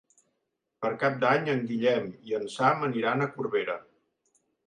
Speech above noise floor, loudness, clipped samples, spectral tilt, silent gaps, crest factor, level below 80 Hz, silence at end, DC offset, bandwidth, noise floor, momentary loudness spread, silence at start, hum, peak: 53 dB; -28 LUFS; under 0.1%; -6.5 dB/octave; none; 20 dB; -76 dBFS; 0.85 s; under 0.1%; 10.5 kHz; -81 dBFS; 9 LU; 0.8 s; none; -8 dBFS